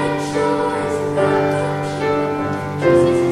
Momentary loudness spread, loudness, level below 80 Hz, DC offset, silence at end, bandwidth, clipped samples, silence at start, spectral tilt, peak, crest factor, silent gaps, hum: 7 LU; -18 LUFS; -48 dBFS; under 0.1%; 0 s; 12.5 kHz; under 0.1%; 0 s; -6.5 dB/octave; -2 dBFS; 14 dB; none; none